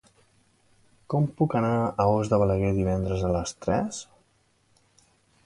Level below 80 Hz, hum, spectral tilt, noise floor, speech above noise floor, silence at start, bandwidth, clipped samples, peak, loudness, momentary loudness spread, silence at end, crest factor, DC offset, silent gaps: -44 dBFS; none; -7 dB/octave; -66 dBFS; 42 dB; 1.1 s; 11.5 kHz; under 0.1%; -8 dBFS; -26 LUFS; 6 LU; 1.4 s; 20 dB; under 0.1%; none